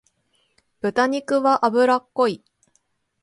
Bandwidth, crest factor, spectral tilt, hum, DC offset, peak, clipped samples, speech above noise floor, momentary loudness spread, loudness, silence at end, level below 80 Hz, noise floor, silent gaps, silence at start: 11.5 kHz; 18 dB; -5 dB/octave; none; under 0.1%; -4 dBFS; under 0.1%; 49 dB; 8 LU; -20 LUFS; 0.85 s; -68 dBFS; -68 dBFS; none; 0.85 s